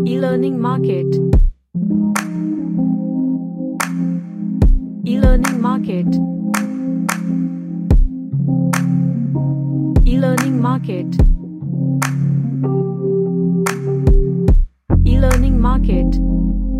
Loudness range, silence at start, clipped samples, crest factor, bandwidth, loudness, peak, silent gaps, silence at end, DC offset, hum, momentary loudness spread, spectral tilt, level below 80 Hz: 3 LU; 0 s; under 0.1%; 14 dB; 14.5 kHz; -17 LUFS; 0 dBFS; none; 0 s; under 0.1%; none; 6 LU; -7.5 dB/octave; -18 dBFS